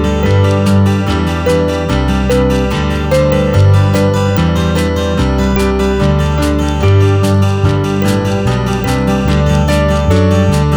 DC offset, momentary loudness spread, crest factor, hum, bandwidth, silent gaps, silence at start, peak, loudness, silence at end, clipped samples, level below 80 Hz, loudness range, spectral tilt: under 0.1%; 4 LU; 10 dB; none; over 20 kHz; none; 0 s; 0 dBFS; -12 LUFS; 0 s; under 0.1%; -20 dBFS; 1 LU; -7 dB/octave